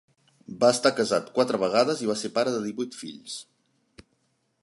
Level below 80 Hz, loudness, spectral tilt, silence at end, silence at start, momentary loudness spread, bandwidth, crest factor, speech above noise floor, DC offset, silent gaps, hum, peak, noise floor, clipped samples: -70 dBFS; -25 LUFS; -4 dB/octave; 0.6 s; 0.5 s; 16 LU; 11.5 kHz; 22 dB; 47 dB; under 0.1%; none; none; -6 dBFS; -72 dBFS; under 0.1%